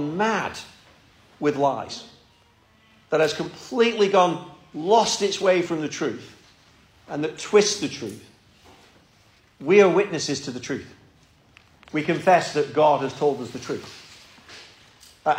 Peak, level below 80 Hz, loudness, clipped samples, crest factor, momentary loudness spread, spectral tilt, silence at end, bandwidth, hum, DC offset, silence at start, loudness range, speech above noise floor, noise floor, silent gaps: -4 dBFS; -64 dBFS; -22 LUFS; under 0.1%; 20 dB; 19 LU; -4 dB/octave; 0 s; 15 kHz; none; under 0.1%; 0 s; 5 LU; 36 dB; -58 dBFS; none